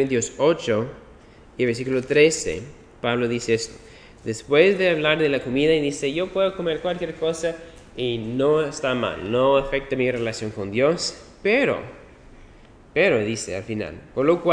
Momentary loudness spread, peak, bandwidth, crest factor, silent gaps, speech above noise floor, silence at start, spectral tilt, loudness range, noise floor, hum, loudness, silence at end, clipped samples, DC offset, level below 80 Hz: 12 LU; -2 dBFS; 10.5 kHz; 20 dB; none; 26 dB; 0 s; -4.5 dB/octave; 3 LU; -48 dBFS; none; -22 LUFS; 0 s; under 0.1%; under 0.1%; -48 dBFS